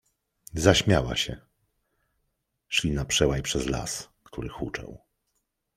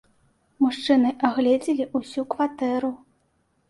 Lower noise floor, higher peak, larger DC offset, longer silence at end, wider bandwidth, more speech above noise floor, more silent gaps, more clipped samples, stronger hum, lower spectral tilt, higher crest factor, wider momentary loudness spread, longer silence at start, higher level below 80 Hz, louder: first, -78 dBFS vs -68 dBFS; about the same, -4 dBFS vs -4 dBFS; neither; about the same, 0.8 s vs 0.75 s; first, 16 kHz vs 11.5 kHz; first, 52 dB vs 45 dB; neither; neither; neither; about the same, -4 dB/octave vs -5 dB/octave; first, 26 dB vs 20 dB; first, 17 LU vs 9 LU; about the same, 0.55 s vs 0.6 s; first, -42 dBFS vs -66 dBFS; second, -26 LUFS vs -23 LUFS